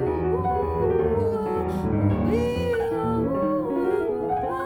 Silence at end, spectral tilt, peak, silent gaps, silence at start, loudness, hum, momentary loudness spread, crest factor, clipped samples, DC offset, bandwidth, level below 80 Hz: 0 s; -8.5 dB/octave; -10 dBFS; none; 0 s; -24 LUFS; none; 3 LU; 14 dB; under 0.1%; under 0.1%; 17.5 kHz; -40 dBFS